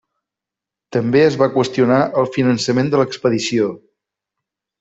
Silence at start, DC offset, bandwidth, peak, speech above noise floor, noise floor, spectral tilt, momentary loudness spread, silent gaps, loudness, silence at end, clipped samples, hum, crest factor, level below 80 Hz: 0.9 s; under 0.1%; 8 kHz; -2 dBFS; 70 dB; -86 dBFS; -6 dB/octave; 6 LU; none; -16 LUFS; 1.05 s; under 0.1%; none; 16 dB; -58 dBFS